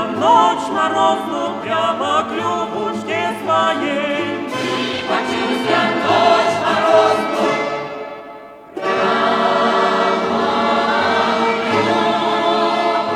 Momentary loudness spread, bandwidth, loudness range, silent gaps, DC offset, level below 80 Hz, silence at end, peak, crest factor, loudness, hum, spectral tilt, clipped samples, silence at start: 9 LU; 13.5 kHz; 3 LU; none; under 0.1%; -60 dBFS; 0 s; -2 dBFS; 16 dB; -16 LUFS; none; -4 dB/octave; under 0.1%; 0 s